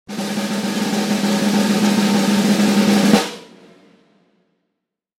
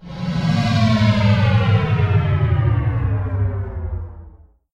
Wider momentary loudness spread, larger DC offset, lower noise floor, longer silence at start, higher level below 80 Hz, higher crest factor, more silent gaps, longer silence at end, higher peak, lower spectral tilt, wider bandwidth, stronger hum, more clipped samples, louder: second, 8 LU vs 11 LU; neither; first, -78 dBFS vs -44 dBFS; about the same, 0.1 s vs 0 s; second, -60 dBFS vs -32 dBFS; about the same, 18 dB vs 14 dB; neither; first, 1.75 s vs 0.45 s; first, 0 dBFS vs -4 dBFS; second, -4.5 dB/octave vs -7.5 dB/octave; first, 16.5 kHz vs 7.6 kHz; neither; neither; about the same, -17 LUFS vs -18 LUFS